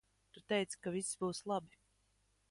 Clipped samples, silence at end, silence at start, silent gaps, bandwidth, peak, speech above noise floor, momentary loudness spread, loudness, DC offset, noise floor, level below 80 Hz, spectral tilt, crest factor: under 0.1%; 0.85 s; 0.35 s; none; 11.5 kHz; -22 dBFS; 37 dB; 4 LU; -40 LUFS; under 0.1%; -77 dBFS; -76 dBFS; -4 dB/octave; 20 dB